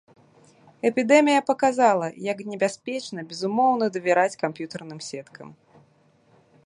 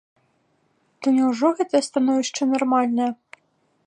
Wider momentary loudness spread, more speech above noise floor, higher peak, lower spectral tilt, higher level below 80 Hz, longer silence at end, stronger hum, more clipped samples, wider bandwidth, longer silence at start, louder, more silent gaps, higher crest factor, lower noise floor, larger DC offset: first, 17 LU vs 6 LU; second, 37 dB vs 46 dB; first, -2 dBFS vs -6 dBFS; about the same, -4.5 dB/octave vs -3.5 dB/octave; about the same, -76 dBFS vs -78 dBFS; first, 1.15 s vs 0.7 s; neither; neither; about the same, 11 kHz vs 10.5 kHz; second, 0.85 s vs 1 s; about the same, -23 LUFS vs -21 LUFS; neither; first, 22 dB vs 16 dB; second, -60 dBFS vs -66 dBFS; neither